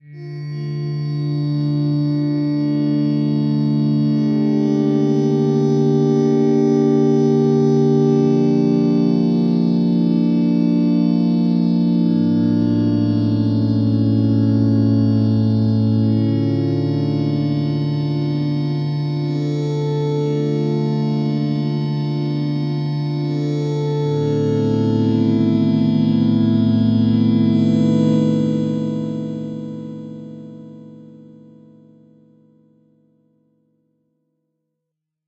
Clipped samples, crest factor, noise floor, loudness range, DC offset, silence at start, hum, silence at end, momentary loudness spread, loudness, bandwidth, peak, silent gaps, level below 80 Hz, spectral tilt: under 0.1%; 12 dB; -80 dBFS; 5 LU; under 0.1%; 0.05 s; none; 4 s; 6 LU; -17 LUFS; 7 kHz; -4 dBFS; none; -54 dBFS; -9.5 dB/octave